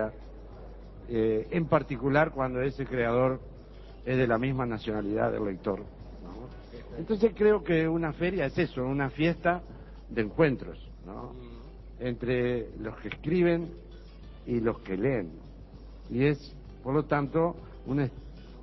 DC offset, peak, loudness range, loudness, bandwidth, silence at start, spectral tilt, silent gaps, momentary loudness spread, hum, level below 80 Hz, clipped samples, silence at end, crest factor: under 0.1%; -10 dBFS; 4 LU; -29 LUFS; 6 kHz; 0 s; -9 dB/octave; none; 22 LU; none; -46 dBFS; under 0.1%; 0 s; 20 dB